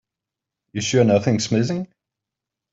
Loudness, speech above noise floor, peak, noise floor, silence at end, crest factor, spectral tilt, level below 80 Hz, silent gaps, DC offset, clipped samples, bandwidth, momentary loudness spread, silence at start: -20 LUFS; 67 dB; -2 dBFS; -86 dBFS; 0.9 s; 20 dB; -5.5 dB/octave; -60 dBFS; none; under 0.1%; under 0.1%; 8 kHz; 15 LU; 0.75 s